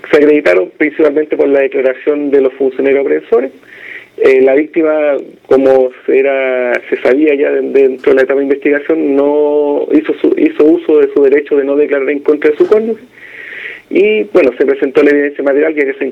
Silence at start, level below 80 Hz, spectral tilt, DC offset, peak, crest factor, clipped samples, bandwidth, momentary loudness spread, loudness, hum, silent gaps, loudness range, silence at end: 0.05 s; -56 dBFS; -6.5 dB/octave; under 0.1%; 0 dBFS; 10 dB; 0.2%; 6.2 kHz; 6 LU; -10 LUFS; none; none; 2 LU; 0 s